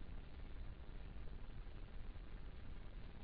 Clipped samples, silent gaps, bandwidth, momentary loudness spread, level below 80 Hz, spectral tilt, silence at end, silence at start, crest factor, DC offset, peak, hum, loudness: under 0.1%; none; 5 kHz; 1 LU; -52 dBFS; -6 dB/octave; 0 s; 0 s; 12 dB; under 0.1%; -38 dBFS; none; -57 LUFS